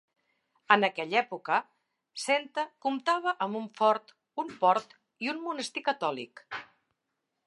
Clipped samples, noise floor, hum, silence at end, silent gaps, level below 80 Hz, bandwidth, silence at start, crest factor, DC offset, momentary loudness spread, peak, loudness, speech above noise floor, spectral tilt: under 0.1%; -83 dBFS; none; 0.8 s; none; -86 dBFS; 11.5 kHz; 0.7 s; 26 dB; under 0.1%; 15 LU; -6 dBFS; -29 LUFS; 54 dB; -3.5 dB/octave